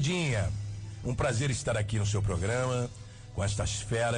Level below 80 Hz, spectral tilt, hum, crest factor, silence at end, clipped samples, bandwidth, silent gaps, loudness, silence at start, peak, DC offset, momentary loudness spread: -44 dBFS; -5 dB/octave; none; 10 dB; 0 s; under 0.1%; 10.5 kHz; none; -31 LUFS; 0 s; -20 dBFS; under 0.1%; 9 LU